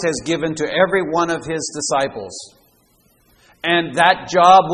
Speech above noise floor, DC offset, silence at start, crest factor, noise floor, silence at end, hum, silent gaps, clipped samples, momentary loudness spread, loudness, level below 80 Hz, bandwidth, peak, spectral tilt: 40 dB; under 0.1%; 0 s; 18 dB; -57 dBFS; 0 s; none; none; under 0.1%; 12 LU; -17 LUFS; -54 dBFS; 11 kHz; 0 dBFS; -3.5 dB/octave